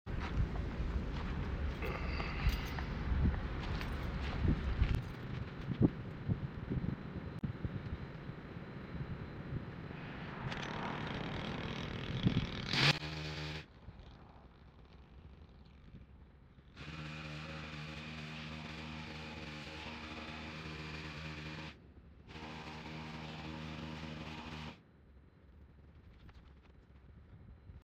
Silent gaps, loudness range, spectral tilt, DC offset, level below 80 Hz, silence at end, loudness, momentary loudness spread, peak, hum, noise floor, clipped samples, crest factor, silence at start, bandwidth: none; 13 LU; -6 dB/octave; under 0.1%; -46 dBFS; 0.05 s; -41 LUFS; 23 LU; -14 dBFS; none; -61 dBFS; under 0.1%; 26 dB; 0.05 s; 16 kHz